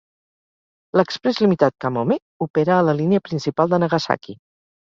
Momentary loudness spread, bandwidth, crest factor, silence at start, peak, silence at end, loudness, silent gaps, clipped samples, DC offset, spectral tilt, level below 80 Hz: 7 LU; 7.6 kHz; 18 dB; 0.95 s; -2 dBFS; 0.5 s; -20 LUFS; 2.22-2.40 s, 2.50-2.54 s; under 0.1%; under 0.1%; -7 dB/octave; -60 dBFS